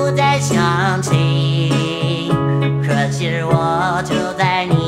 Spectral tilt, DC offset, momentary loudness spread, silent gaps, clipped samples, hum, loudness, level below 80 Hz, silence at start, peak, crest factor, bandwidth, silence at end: -5.5 dB/octave; under 0.1%; 4 LU; none; under 0.1%; none; -16 LUFS; -46 dBFS; 0 s; -2 dBFS; 14 dB; 12.5 kHz; 0 s